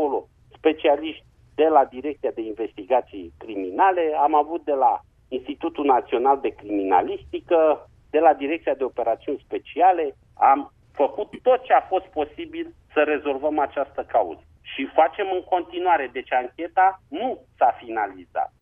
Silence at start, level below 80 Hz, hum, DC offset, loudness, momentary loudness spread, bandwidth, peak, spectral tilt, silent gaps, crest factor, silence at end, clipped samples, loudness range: 0 s; -58 dBFS; none; under 0.1%; -23 LUFS; 12 LU; 3.7 kHz; -4 dBFS; -7 dB/octave; none; 20 dB; 0.15 s; under 0.1%; 2 LU